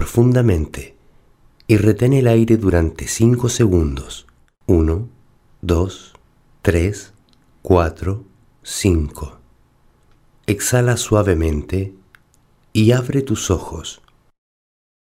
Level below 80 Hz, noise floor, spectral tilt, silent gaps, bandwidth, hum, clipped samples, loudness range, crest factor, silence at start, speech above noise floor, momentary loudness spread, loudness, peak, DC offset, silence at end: -32 dBFS; -55 dBFS; -6 dB/octave; none; 16 kHz; none; under 0.1%; 5 LU; 18 dB; 0 s; 39 dB; 18 LU; -17 LUFS; 0 dBFS; under 0.1%; 1.2 s